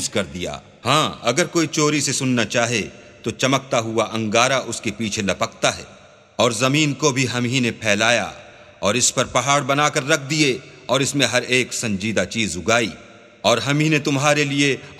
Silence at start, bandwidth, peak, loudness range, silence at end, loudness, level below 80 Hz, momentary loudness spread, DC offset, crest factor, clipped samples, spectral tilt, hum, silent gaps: 0 s; 15.5 kHz; 0 dBFS; 2 LU; 0 s; -19 LUFS; -54 dBFS; 8 LU; under 0.1%; 20 dB; under 0.1%; -3.5 dB/octave; none; none